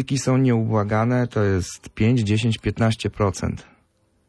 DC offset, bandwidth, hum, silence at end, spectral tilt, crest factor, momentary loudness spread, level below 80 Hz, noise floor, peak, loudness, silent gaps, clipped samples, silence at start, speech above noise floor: under 0.1%; 11 kHz; none; 0.65 s; -6.5 dB/octave; 12 dB; 8 LU; -44 dBFS; -64 dBFS; -8 dBFS; -21 LUFS; none; under 0.1%; 0 s; 43 dB